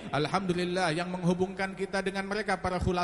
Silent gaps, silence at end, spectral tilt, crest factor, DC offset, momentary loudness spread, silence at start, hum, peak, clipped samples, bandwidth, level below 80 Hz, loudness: none; 0 s; -5.5 dB/octave; 16 dB; under 0.1%; 3 LU; 0 s; none; -14 dBFS; under 0.1%; 11.5 kHz; -50 dBFS; -30 LUFS